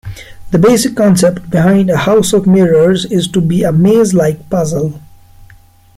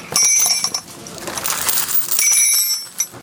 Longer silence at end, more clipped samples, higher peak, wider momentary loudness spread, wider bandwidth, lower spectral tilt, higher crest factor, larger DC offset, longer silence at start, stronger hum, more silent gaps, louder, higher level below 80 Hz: first, 0.55 s vs 0 s; neither; about the same, 0 dBFS vs 0 dBFS; second, 7 LU vs 15 LU; second, 15.5 kHz vs 18 kHz; first, -6 dB/octave vs 1.5 dB/octave; second, 10 dB vs 18 dB; neither; about the same, 0.05 s vs 0 s; neither; neither; first, -11 LUFS vs -14 LUFS; first, -40 dBFS vs -58 dBFS